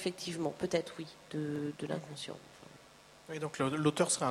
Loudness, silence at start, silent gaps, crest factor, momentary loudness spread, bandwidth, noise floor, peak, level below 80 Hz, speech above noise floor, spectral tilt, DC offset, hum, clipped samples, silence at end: -36 LUFS; 0 s; none; 22 dB; 24 LU; 15.5 kHz; -59 dBFS; -14 dBFS; -72 dBFS; 23 dB; -4.5 dB/octave; under 0.1%; none; under 0.1%; 0 s